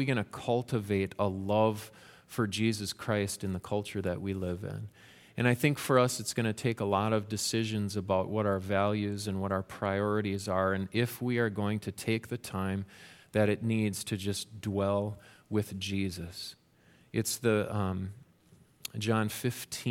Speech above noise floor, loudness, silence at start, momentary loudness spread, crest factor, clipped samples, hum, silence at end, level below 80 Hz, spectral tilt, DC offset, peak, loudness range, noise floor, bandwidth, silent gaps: 32 dB; -32 LUFS; 0 s; 10 LU; 22 dB; under 0.1%; none; 0 s; -64 dBFS; -5.5 dB/octave; under 0.1%; -10 dBFS; 4 LU; -63 dBFS; 17 kHz; none